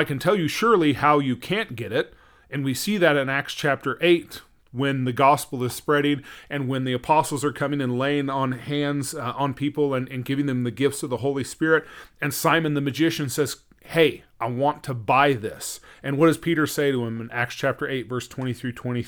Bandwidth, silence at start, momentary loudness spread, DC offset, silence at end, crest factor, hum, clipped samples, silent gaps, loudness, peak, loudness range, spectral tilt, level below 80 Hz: over 20 kHz; 0 s; 10 LU; under 0.1%; 0 s; 20 dB; none; under 0.1%; none; -23 LUFS; -2 dBFS; 3 LU; -5 dB/octave; -58 dBFS